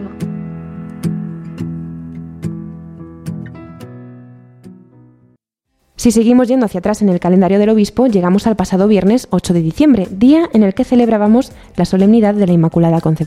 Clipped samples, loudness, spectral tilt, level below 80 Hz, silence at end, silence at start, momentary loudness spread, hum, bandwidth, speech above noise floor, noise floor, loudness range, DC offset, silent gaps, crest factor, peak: under 0.1%; -13 LUFS; -7.5 dB/octave; -42 dBFS; 0 s; 0 s; 18 LU; none; 14.5 kHz; 55 dB; -66 dBFS; 18 LU; under 0.1%; none; 14 dB; 0 dBFS